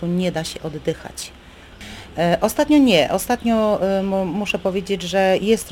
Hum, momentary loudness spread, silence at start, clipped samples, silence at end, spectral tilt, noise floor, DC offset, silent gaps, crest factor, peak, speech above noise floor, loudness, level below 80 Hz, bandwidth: none; 17 LU; 0 s; under 0.1%; 0 s; -5 dB/octave; -40 dBFS; under 0.1%; none; 18 dB; -2 dBFS; 21 dB; -19 LUFS; -44 dBFS; 17 kHz